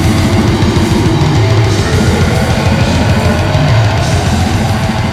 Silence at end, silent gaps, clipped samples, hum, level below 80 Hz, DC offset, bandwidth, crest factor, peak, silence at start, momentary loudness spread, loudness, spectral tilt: 0 s; none; under 0.1%; none; -22 dBFS; under 0.1%; 15 kHz; 10 dB; 0 dBFS; 0 s; 2 LU; -11 LUFS; -6 dB/octave